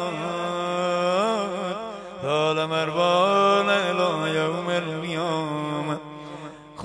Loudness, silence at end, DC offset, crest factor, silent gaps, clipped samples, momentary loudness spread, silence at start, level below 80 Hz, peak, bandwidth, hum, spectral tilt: -24 LUFS; 0 s; under 0.1%; 18 dB; none; under 0.1%; 14 LU; 0 s; -64 dBFS; -6 dBFS; 10.5 kHz; none; -5 dB/octave